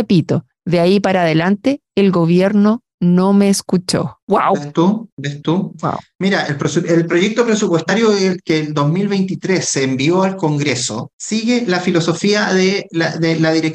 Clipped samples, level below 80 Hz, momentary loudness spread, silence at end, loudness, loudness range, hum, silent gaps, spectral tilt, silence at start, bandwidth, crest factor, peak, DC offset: under 0.1%; -56 dBFS; 6 LU; 0 s; -15 LUFS; 3 LU; none; 2.94-2.98 s, 4.22-4.27 s, 5.12-5.17 s, 11.13-11.19 s; -5.5 dB/octave; 0 s; 12.5 kHz; 12 dB; -4 dBFS; under 0.1%